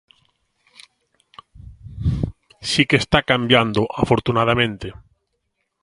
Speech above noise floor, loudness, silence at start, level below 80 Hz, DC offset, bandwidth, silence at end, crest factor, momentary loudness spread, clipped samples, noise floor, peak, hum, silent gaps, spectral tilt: 55 dB; -19 LUFS; 1.55 s; -38 dBFS; under 0.1%; 11.5 kHz; 0.9 s; 22 dB; 15 LU; under 0.1%; -73 dBFS; 0 dBFS; none; none; -5 dB/octave